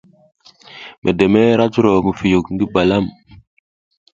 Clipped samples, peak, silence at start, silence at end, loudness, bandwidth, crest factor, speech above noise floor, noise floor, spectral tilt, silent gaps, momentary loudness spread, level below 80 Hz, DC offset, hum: under 0.1%; 0 dBFS; 0.75 s; 1.05 s; -15 LUFS; 8 kHz; 16 dB; 26 dB; -40 dBFS; -7.5 dB/octave; 0.98-1.02 s; 12 LU; -44 dBFS; under 0.1%; none